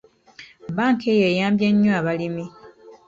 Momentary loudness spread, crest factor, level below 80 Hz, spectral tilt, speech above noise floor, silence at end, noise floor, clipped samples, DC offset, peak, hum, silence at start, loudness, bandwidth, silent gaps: 14 LU; 14 dB; -60 dBFS; -7 dB/octave; 28 dB; 0.15 s; -47 dBFS; under 0.1%; under 0.1%; -8 dBFS; none; 0.4 s; -20 LUFS; 7.6 kHz; none